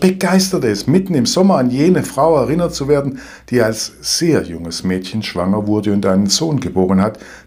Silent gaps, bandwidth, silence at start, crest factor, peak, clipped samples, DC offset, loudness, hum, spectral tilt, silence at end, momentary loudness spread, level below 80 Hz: none; 16 kHz; 0 s; 14 dB; 0 dBFS; under 0.1%; under 0.1%; -15 LUFS; none; -5 dB/octave; 0.05 s; 7 LU; -44 dBFS